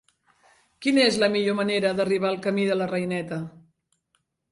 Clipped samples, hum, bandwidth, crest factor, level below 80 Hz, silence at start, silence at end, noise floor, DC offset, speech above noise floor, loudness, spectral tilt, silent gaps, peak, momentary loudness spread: under 0.1%; none; 11.5 kHz; 18 dB; -66 dBFS; 0.8 s; 1 s; -73 dBFS; under 0.1%; 50 dB; -24 LUFS; -5 dB/octave; none; -8 dBFS; 10 LU